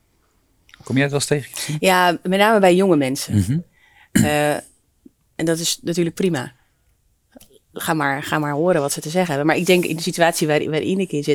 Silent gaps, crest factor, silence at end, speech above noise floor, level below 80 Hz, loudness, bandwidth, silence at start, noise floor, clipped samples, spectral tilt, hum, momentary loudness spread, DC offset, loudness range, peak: none; 18 dB; 0 s; 44 dB; -56 dBFS; -19 LUFS; 19.5 kHz; 0.85 s; -62 dBFS; under 0.1%; -4.5 dB/octave; none; 9 LU; under 0.1%; 6 LU; -2 dBFS